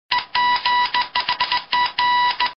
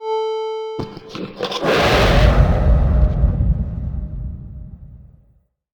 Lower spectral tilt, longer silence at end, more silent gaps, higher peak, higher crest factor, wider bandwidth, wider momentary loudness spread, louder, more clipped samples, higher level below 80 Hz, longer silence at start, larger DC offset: second, -2.5 dB/octave vs -6.5 dB/octave; second, 0.05 s vs 0.7 s; neither; about the same, -2 dBFS vs 0 dBFS; about the same, 18 dB vs 18 dB; second, 6 kHz vs 19.5 kHz; second, 3 LU vs 17 LU; about the same, -19 LUFS vs -18 LUFS; neither; second, -56 dBFS vs -20 dBFS; about the same, 0.1 s vs 0 s; neither